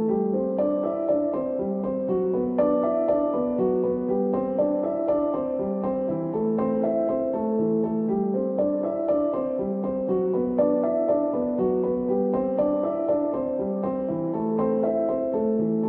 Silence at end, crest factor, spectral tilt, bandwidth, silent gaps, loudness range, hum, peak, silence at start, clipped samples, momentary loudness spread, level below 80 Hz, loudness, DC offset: 0 s; 14 dB; -12.5 dB/octave; 3.4 kHz; none; 1 LU; none; -10 dBFS; 0 s; under 0.1%; 4 LU; -56 dBFS; -25 LUFS; under 0.1%